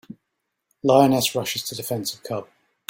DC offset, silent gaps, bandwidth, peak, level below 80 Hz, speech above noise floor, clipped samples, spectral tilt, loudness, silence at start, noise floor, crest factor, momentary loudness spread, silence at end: under 0.1%; none; 16.5 kHz; -2 dBFS; -62 dBFS; 57 dB; under 0.1%; -4.5 dB/octave; -22 LUFS; 0.85 s; -78 dBFS; 20 dB; 15 LU; 0.45 s